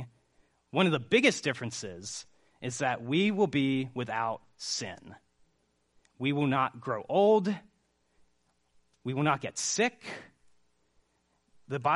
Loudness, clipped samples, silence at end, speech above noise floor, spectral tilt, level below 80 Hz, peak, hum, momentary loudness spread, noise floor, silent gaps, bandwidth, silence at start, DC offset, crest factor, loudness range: -30 LUFS; under 0.1%; 0 s; 44 dB; -4.5 dB/octave; -72 dBFS; -8 dBFS; none; 17 LU; -74 dBFS; none; 11.5 kHz; 0 s; under 0.1%; 22 dB; 5 LU